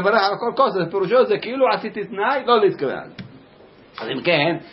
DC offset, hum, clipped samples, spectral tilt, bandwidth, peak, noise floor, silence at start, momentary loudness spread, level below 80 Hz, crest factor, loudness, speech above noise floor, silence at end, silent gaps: under 0.1%; none; under 0.1%; -9.5 dB/octave; 5.8 kHz; -4 dBFS; -48 dBFS; 0 s; 15 LU; -64 dBFS; 16 dB; -19 LUFS; 28 dB; 0 s; none